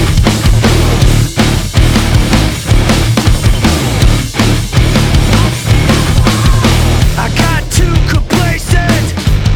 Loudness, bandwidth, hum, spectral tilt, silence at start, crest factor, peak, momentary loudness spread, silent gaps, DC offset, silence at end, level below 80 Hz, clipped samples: -10 LUFS; 19 kHz; none; -5 dB/octave; 0 s; 8 dB; 0 dBFS; 2 LU; none; under 0.1%; 0 s; -14 dBFS; 0.2%